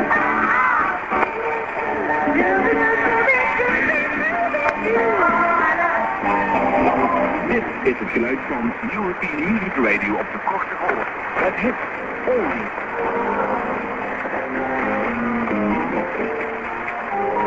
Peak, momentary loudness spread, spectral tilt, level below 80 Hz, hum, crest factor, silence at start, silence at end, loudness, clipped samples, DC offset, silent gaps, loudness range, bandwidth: 0 dBFS; 7 LU; -7 dB/octave; -46 dBFS; none; 20 dB; 0 s; 0 s; -20 LUFS; under 0.1%; under 0.1%; none; 5 LU; 7.8 kHz